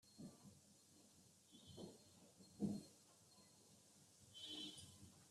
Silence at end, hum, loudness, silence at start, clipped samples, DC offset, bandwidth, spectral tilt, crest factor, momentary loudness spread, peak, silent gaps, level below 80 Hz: 0 s; none; -55 LUFS; 0.05 s; under 0.1%; under 0.1%; 13.5 kHz; -4.5 dB/octave; 24 dB; 19 LU; -34 dBFS; none; -88 dBFS